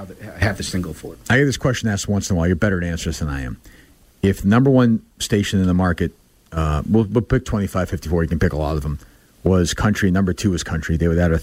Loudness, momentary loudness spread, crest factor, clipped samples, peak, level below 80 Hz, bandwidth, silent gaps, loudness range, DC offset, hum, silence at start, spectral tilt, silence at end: -19 LUFS; 10 LU; 14 dB; under 0.1%; -4 dBFS; -32 dBFS; 16 kHz; none; 3 LU; under 0.1%; none; 0 s; -6 dB/octave; 0 s